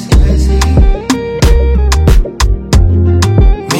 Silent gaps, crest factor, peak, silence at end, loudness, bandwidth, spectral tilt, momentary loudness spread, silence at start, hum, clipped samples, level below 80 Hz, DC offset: none; 8 dB; 0 dBFS; 0 s; -10 LUFS; 15.5 kHz; -6 dB/octave; 4 LU; 0 s; none; 0.3%; -10 dBFS; under 0.1%